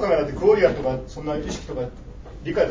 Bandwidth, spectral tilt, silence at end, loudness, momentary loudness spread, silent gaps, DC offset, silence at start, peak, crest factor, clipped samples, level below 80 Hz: 7.6 kHz; -6 dB/octave; 0 s; -23 LUFS; 17 LU; none; under 0.1%; 0 s; -4 dBFS; 18 dB; under 0.1%; -40 dBFS